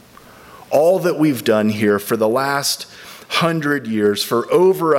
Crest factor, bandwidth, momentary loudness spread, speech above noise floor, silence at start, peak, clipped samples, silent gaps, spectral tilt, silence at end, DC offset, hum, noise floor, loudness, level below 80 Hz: 14 dB; 16.5 kHz; 6 LU; 27 dB; 0.5 s; -2 dBFS; under 0.1%; none; -4.5 dB/octave; 0 s; under 0.1%; none; -43 dBFS; -17 LUFS; -62 dBFS